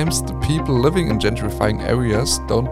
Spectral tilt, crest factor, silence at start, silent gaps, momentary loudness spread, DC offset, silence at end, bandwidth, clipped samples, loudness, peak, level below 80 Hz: -5 dB/octave; 18 dB; 0 s; none; 4 LU; 0.7%; 0 s; 16.5 kHz; under 0.1%; -19 LUFS; 0 dBFS; -30 dBFS